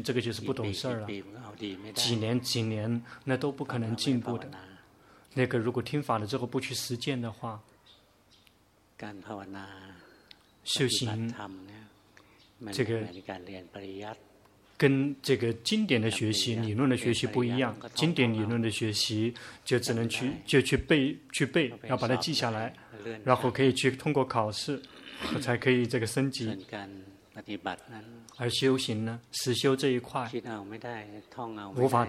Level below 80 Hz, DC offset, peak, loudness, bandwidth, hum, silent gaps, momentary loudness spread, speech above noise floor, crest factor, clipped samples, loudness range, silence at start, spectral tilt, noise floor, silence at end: -60 dBFS; under 0.1%; -8 dBFS; -30 LUFS; 15.5 kHz; none; none; 17 LU; 34 dB; 24 dB; under 0.1%; 7 LU; 0 s; -5 dB/octave; -65 dBFS; 0 s